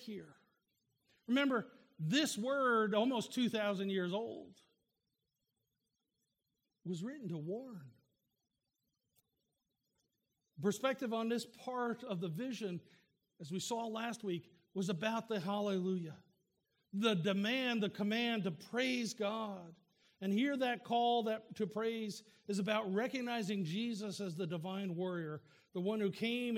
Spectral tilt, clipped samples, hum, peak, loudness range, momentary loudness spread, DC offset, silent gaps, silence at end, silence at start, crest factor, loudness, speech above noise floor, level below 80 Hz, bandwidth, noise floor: -5 dB/octave; under 0.1%; none; -20 dBFS; 12 LU; 12 LU; under 0.1%; none; 0 s; 0 s; 20 dB; -38 LUFS; 50 dB; -88 dBFS; 16.5 kHz; -88 dBFS